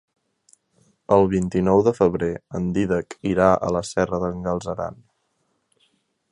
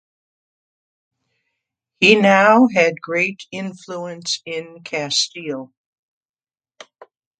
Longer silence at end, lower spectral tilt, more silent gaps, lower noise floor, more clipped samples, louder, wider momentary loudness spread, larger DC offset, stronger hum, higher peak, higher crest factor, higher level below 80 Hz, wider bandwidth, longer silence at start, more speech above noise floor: second, 1.4 s vs 1.75 s; first, -7 dB/octave vs -3.5 dB/octave; neither; second, -71 dBFS vs under -90 dBFS; neither; second, -21 LUFS vs -16 LUFS; second, 9 LU vs 18 LU; neither; neither; about the same, -2 dBFS vs 0 dBFS; about the same, 20 dB vs 20 dB; first, -46 dBFS vs -68 dBFS; first, 11 kHz vs 9.4 kHz; second, 1.1 s vs 2 s; second, 50 dB vs over 72 dB